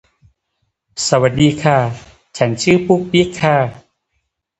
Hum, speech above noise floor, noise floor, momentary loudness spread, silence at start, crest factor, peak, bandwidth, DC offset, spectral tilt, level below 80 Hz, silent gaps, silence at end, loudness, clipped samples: none; 56 dB; -70 dBFS; 11 LU; 0.95 s; 16 dB; 0 dBFS; 9 kHz; under 0.1%; -5.5 dB/octave; -46 dBFS; none; 0.8 s; -15 LUFS; under 0.1%